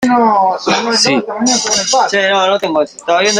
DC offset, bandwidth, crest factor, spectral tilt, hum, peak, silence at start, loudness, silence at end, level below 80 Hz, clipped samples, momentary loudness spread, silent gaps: under 0.1%; 14 kHz; 12 dB; -2 dB/octave; none; 0 dBFS; 0 s; -12 LUFS; 0 s; -54 dBFS; under 0.1%; 4 LU; none